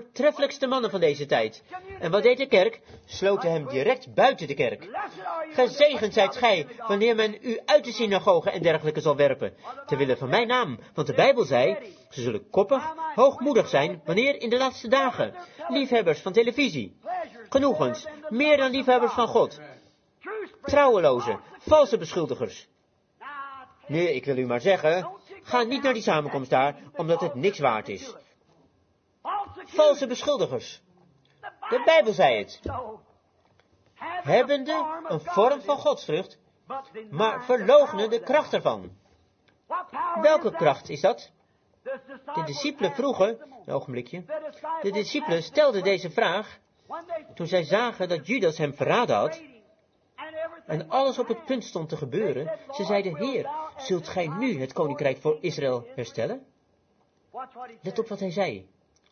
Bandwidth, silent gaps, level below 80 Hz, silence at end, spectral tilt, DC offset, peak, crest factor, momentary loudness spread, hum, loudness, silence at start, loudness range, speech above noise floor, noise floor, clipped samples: 6.8 kHz; none; -64 dBFS; 0.5 s; -5 dB/octave; under 0.1%; -6 dBFS; 20 dB; 16 LU; none; -25 LUFS; 0 s; 5 LU; 42 dB; -67 dBFS; under 0.1%